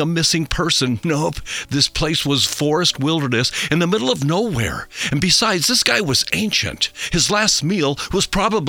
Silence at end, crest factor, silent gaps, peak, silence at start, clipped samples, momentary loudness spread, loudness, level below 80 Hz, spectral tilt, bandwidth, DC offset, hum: 0 s; 18 dB; none; 0 dBFS; 0 s; under 0.1%; 7 LU; -17 LUFS; -38 dBFS; -3.5 dB/octave; 20 kHz; under 0.1%; none